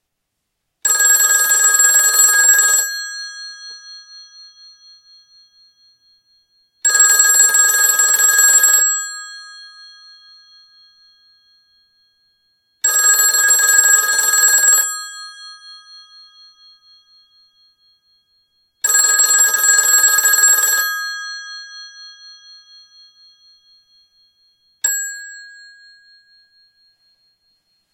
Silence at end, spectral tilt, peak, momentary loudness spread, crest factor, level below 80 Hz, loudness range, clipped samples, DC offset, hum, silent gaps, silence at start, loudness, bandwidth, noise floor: 2.45 s; 5 dB/octave; 0 dBFS; 22 LU; 18 dB; -68 dBFS; 16 LU; under 0.1%; under 0.1%; none; none; 0.85 s; -11 LUFS; 17.5 kHz; -75 dBFS